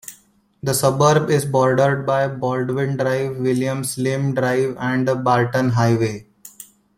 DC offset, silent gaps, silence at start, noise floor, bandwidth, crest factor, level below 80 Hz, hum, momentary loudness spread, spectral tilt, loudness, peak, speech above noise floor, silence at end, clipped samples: under 0.1%; none; 0.1 s; -55 dBFS; 16.5 kHz; 16 dB; -56 dBFS; none; 7 LU; -6 dB/octave; -19 LUFS; -2 dBFS; 37 dB; 0.35 s; under 0.1%